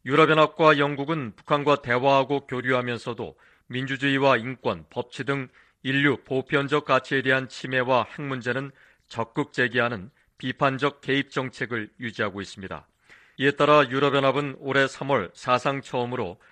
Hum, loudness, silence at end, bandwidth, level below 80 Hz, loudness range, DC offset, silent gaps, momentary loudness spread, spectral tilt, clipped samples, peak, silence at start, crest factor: none; -24 LUFS; 0.2 s; 9.6 kHz; -64 dBFS; 4 LU; under 0.1%; none; 15 LU; -6 dB/octave; under 0.1%; -4 dBFS; 0.05 s; 20 dB